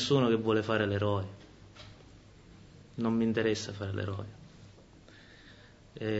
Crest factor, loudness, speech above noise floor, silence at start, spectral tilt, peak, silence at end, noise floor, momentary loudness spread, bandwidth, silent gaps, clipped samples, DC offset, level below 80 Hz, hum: 20 dB; -31 LUFS; 26 dB; 0 s; -6 dB/octave; -14 dBFS; 0 s; -55 dBFS; 26 LU; 8 kHz; none; under 0.1%; under 0.1%; -62 dBFS; none